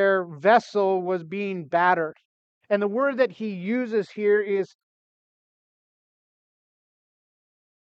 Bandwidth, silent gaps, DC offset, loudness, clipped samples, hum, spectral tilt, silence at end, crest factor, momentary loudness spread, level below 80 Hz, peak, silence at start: 7.6 kHz; 2.25-2.61 s; under 0.1%; -24 LUFS; under 0.1%; none; -6.5 dB/octave; 3.3 s; 20 dB; 10 LU; -84 dBFS; -6 dBFS; 0 s